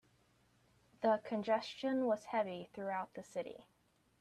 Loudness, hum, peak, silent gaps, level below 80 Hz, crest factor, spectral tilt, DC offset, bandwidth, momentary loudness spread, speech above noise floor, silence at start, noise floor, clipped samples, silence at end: -39 LUFS; none; -22 dBFS; none; -80 dBFS; 18 dB; -5.5 dB/octave; under 0.1%; 12 kHz; 10 LU; 35 dB; 1 s; -73 dBFS; under 0.1%; 0.6 s